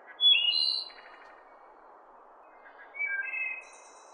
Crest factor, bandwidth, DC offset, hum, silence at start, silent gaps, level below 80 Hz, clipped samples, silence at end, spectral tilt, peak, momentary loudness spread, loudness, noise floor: 18 dB; 9.8 kHz; under 0.1%; none; 0.05 s; none; -80 dBFS; under 0.1%; 0.25 s; 3 dB/octave; -14 dBFS; 21 LU; -26 LUFS; -55 dBFS